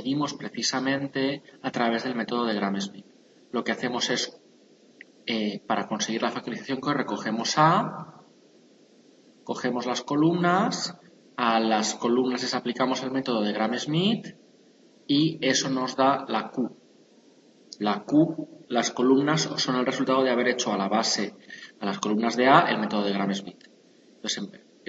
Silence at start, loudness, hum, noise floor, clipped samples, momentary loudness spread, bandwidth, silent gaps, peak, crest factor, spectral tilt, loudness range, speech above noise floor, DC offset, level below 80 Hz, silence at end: 0 s; -26 LUFS; none; -57 dBFS; under 0.1%; 12 LU; 8 kHz; none; -2 dBFS; 24 dB; -4 dB/octave; 5 LU; 31 dB; under 0.1%; -76 dBFS; 0.3 s